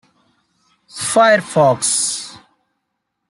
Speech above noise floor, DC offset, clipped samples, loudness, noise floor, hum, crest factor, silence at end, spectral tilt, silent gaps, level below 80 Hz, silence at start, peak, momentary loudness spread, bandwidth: 60 dB; under 0.1%; under 0.1%; -15 LUFS; -74 dBFS; none; 16 dB; 0.9 s; -3 dB/octave; none; -64 dBFS; 0.95 s; -2 dBFS; 17 LU; 12.5 kHz